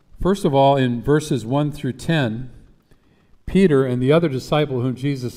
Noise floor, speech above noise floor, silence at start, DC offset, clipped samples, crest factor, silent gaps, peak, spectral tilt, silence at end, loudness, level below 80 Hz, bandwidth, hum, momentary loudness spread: -55 dBFS; 36 dB; 0.15 s; under 0.1%; under 0.1%; 16 dB; none; -4 dBFS; -7 dB/octave; 0 s; -19 LUFS; -40 dBFS; 15 kHz; none; 9 LU